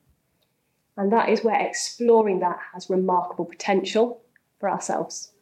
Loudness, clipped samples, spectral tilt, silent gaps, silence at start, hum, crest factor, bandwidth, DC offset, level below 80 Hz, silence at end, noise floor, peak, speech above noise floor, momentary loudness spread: -23 LUFS; under 0.1%; -4.5 dB/octave; none; 0.95 s; none; 16 dB; 12 kHz; under 0.1%; -76 dBFS; 0.15 s; -71 dBFS; -8 dBFS; 49 dB; 12 LU